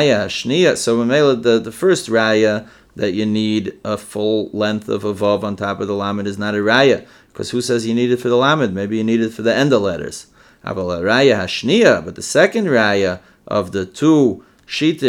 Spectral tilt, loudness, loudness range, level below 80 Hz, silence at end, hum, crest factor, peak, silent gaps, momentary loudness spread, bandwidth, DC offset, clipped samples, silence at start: -5 dB/octave; -17 LUFS; 4 LU; -56 dBFS; 0 s; none; 16 dB; 0 dBFS; none; 11 LU; 16.5 kHz; under 0.1%; under 0.1%; 0 s